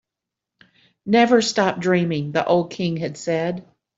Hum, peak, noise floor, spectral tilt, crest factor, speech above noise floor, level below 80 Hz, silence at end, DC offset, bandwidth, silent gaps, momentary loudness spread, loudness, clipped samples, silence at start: none; -4 dBFS; -85 dBFS; -5.5 dB/octave; 18 dB; 66 dB; -64 dBFS; 0.35 s; under 0.1%; 8 kHz; none; 11 LU; -20 LUFS; under 0.1%; 1.05 s